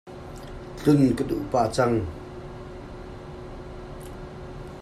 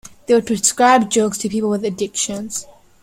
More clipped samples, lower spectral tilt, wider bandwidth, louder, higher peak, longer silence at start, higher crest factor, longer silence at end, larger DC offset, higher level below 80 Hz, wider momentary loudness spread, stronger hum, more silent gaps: neither; first, -7 dB/octave vs -3 dB/octave; second, 13.5 kHz vs 16.5 kHz; second, -23 LUFS vs -17 LUFS; second, -8 dBFS vs -2 dBFS; about the same, 0.05 s vs 0.05 s; about the same, 20 dB vs 16 dB; second, 0 s vs 0.3 s; neither; first, -44 dBFS vs -54 dBFS; first, 19 LU vs 11 LU; neither; neither